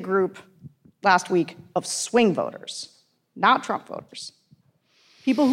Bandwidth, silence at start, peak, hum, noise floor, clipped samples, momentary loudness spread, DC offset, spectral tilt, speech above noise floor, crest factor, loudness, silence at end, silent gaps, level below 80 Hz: 15.5 kHz; 0 s; -6 dBFS; none; -63 dBFS; under 0.1%; 17 LU; under 0.1%; -4 dB/octave; 39 dB; 20 dB; -23 LUFS; 0 s; none; -72 dBFS